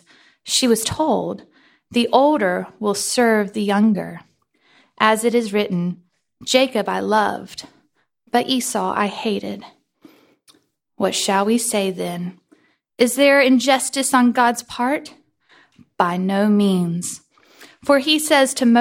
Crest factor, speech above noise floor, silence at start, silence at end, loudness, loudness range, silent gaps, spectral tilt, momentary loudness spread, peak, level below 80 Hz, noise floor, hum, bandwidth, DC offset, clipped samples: 18 dB; 46 dB; 0.45 s; 0 s; -18 LUFS; 6 LU; none; -4 dB/octave; 14 LU; 0 dBFS; -60 dBFS; -64 dBFS; none; 16.5 kHz; under 0.1%; under 0.1%